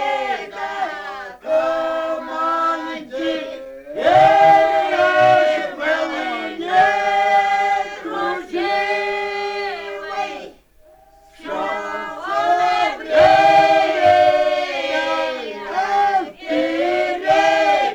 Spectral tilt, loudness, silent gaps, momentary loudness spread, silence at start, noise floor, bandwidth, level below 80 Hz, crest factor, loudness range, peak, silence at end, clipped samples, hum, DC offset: -4 dB/octave; -17 LUFS; none; 14 LU; 0 s; -50 dBFS; 11 kHz; -54 dBFS; 16 dB; 8 LU; -2 dBFS; 0 s; under 0.1%; none; under 0.1%